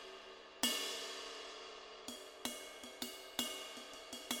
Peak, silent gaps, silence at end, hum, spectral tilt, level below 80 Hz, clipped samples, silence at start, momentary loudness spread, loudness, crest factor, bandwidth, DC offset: -20 dBFS; none; 0 s; none; 0 dB/octave; -76 dBFS; under 0.1%; 0 s; 13 LU; -43 LUFS; 26 dB; over 20 kHz; under 0.1%